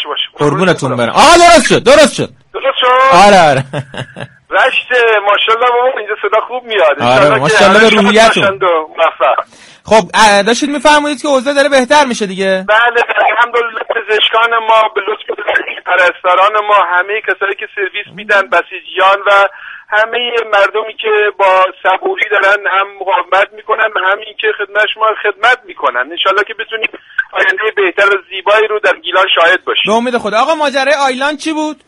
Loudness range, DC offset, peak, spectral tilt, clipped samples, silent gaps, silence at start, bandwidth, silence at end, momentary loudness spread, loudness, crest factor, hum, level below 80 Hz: 4 LU; under 0.1%; 0 dBFS; -3.5 dB/octave; 0.3%; none; 0 s; 13.5 kHz; 0.15 s; 10 LU; -10 LUFS; 10 dB; none; -42 dBFS